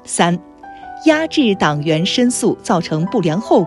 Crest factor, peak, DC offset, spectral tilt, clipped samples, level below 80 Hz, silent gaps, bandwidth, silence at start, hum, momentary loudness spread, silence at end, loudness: 16 dB; 0 dBFS; under 0.1%; -5 dB/octave; under 0.1%; -52 dBFS; none; 12 kHz; 0.05 s; none; 4 LU; 0 s; -16 LUFS